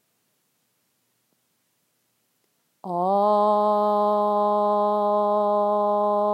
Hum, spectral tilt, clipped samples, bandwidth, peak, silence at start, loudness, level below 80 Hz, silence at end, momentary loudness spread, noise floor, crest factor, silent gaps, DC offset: none; -8 dB/octave; under 0.1%; 12 kHz; -10 dBFS; 2.85 s; -21 LUFS; under -90 dBFS; 0 s; 3 LU; -71 dBFS; 14 dB; none; under 0.1%